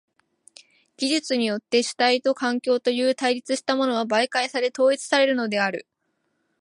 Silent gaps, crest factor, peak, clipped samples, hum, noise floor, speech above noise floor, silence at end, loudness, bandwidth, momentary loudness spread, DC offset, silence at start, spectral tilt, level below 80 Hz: none; 18 dB; -6 dBFS; under 0.1%; none; -73 dBFS; 51 dB; 0.8 s; -22 LUFS; 11.5 kHz; 4 LU; under 0.1%; 1 s; -3 dB/octave; -78 dBFS